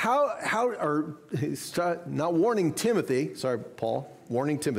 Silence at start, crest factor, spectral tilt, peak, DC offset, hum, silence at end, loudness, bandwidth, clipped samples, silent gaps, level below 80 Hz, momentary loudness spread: 0 s; 14 dB; -5.5 dB/octave; -14 dBFS; under 0.1%; none; 0 s; -28 LUFS; 16 kHz; under 0.1%; none; -68 dBFS; 7 LU